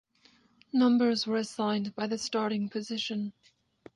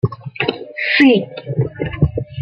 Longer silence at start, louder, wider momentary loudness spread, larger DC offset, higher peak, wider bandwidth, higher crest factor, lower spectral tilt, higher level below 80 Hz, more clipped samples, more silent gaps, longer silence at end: first, 0.75 s vs 0.05 s; second, -30 LUFS vs -17 LUFS; about the same, 9 LU vs 11 LU; neither; second, -16 dBFS vs -2 dBFS; first, 11 kHz vs 6.6 kHz; about the same, 14 dB vs 16 dB; second, -5 dB/octave vs -8 dB/octave; second, -76 dBFS vs -36 dBFS; neither; neither; first, 0.65 s vs 0 s